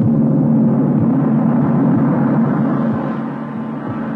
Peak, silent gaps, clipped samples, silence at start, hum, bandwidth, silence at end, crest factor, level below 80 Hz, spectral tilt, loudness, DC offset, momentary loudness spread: -4 dBFS; none; under 0.1%; 0 s; none; 3.6 kHz; 0 s; 12 dB; -50 dBFS; -12 dB/octave; -16 LUFS; under 0.1%; 10 LU